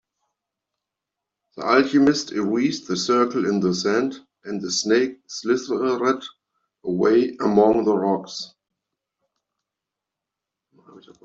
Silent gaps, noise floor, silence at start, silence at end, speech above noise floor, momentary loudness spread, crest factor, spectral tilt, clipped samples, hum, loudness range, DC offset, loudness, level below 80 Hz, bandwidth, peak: none; -85 dBFS; 1.55 s; 0.25 s; 65 dB; 13 LU; 20 dB; -4.5 dB/octave; under 0.1%; none; 3 LU; under 0.1%; -21 LUFS; -64 dBFS; 8 kHz; -4 dBFS